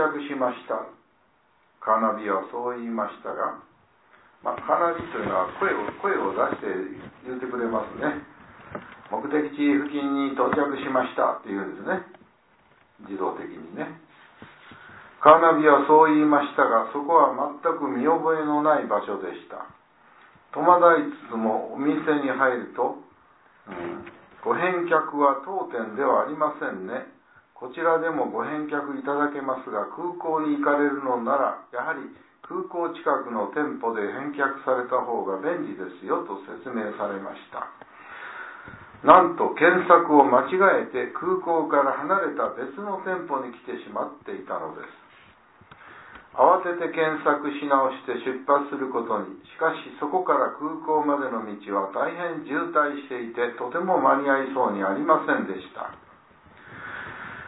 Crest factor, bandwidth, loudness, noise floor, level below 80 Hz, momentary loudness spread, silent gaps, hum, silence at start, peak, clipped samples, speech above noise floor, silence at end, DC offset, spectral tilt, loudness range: 24 dB; 4 kHz; -24 LUFS; -64 dBFS; -68 dBFS; 18 LU; none; none; 0 s; -2 dBFS; under 0.1%; 40 dB; 0 s; under 0.1%; -9.5 dB/octave; 9 LU